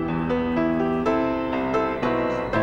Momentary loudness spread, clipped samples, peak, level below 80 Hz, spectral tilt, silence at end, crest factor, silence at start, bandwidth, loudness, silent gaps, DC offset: 2 LU; under 0.1%; -10 dBFS; -44 dBFS; -7.5 dB/octave; 0 s; 14 dB; 0 s; 7.4 kHz; -23 LUFS; none; under 0.1%